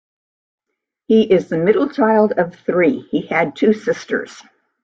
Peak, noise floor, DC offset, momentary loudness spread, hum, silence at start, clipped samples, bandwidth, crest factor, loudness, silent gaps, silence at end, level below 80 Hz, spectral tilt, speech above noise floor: -2 dBFS; -79 dBFS; under 0.1%; 8 LU; none; 1.1 s; under 0.1%; 7.6 kHz; 16 dB; -17 LUFS; none; 0.45 s; -60 dBFS; -7 dB/octave; 62 dB